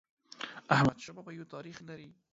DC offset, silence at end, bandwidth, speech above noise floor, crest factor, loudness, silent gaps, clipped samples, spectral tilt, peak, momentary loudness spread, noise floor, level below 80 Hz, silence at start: under 0.1%; 0.3 s; 7.8 kHz; 13 dB; 24 dB; -31 LUFS; none; under 0.1%; -6 dB/octave; -10 dBFS; 20 LU; -47 dBFS; -64 dBFS; 0.45 s